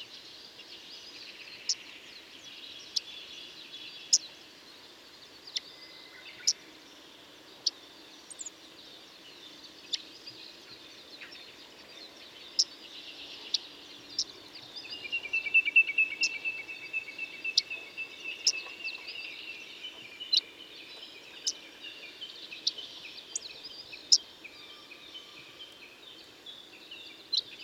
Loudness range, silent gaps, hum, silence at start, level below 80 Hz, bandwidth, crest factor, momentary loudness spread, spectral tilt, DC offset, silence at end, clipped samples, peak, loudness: 12 LU; none; none; 0 s; -78 dBFS; 17.5 kHz; 32 dB; 22 LU; 2 dB/octave; under 0.1%; 0 s; under 0.1%; -6 dBFS; -31 LUFS